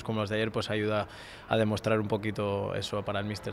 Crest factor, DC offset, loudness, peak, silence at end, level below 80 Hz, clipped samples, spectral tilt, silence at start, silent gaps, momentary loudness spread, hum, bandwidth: 20 dB; under 0.1%; -31 LUFS; -12 dBFS; 0 s; -58 dBFS; under 0.1%; -6 dB/octave; 0 s; none; 5 LU; none; 14.5 kHz